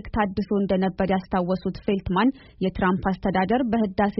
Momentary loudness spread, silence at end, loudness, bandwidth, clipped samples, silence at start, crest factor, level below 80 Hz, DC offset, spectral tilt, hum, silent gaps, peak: 4 LU; 0 s; -24 LUFS; 5.8 kHz; under 0.1%; 0.05 s; 16 dB; -42 dBFS; under 0.1%; -6 dB/octave; none; none; -6 dBFS